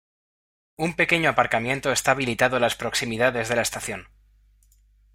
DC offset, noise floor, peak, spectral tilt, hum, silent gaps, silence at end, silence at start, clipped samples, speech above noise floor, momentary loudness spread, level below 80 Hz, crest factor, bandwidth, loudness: under 0.1%; -58 dBFS; -2 dBFS; -3.5 dB/octave; 50 Hz at -50 dBFS; none; 1.1 s; 0.8 s; under 0.1%; 35 dB; 9 LU; -54 dBFS; 22 dB; 16 kHz; -23 LUFS